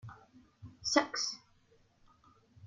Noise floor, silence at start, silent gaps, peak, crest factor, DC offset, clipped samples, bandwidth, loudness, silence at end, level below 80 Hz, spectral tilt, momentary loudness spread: -68 dBFS; 0.05 s; none; -10 dBFS; 30 dB; under 0.1%; under 0.1%; 11 kHz; -33 LUFS; 0 s; -70 dBFS; -2 dB/octave; 25 LU